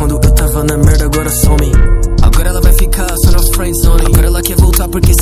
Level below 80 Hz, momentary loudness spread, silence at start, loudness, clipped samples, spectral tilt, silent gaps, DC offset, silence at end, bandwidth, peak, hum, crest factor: -10 dBFS; 3 LU; 0 s; -11 LUFS; 3%; -5 dB/octave; none; under 0.1%; 0 s; 16 kHz; 0 dBFS; none; 8 dB